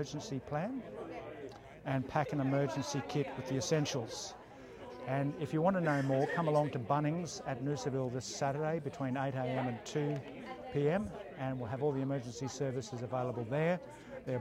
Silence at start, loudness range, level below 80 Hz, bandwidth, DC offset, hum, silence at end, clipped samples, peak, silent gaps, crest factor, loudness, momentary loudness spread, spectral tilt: 0 s; 3 LU; -66 dBFS; 13.5 kHz; under 0.1%; none; 0 s; under 0.1%; -18 dBFS; none; 18 dB; -36 LUFS; 13 LU; -6 dB/octave